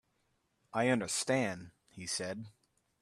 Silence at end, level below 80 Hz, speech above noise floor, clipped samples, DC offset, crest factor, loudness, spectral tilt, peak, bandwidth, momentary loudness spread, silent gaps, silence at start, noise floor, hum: 0.5 s; -74 dBFS; 43 dB; under 0.1%; under 0.1%; 20 dB; -34 LUFS; -3.5 dB/octave; -18 dBFS; 13.5 kHz; 16 LU; none; 0.75 s; -78 dBFS; none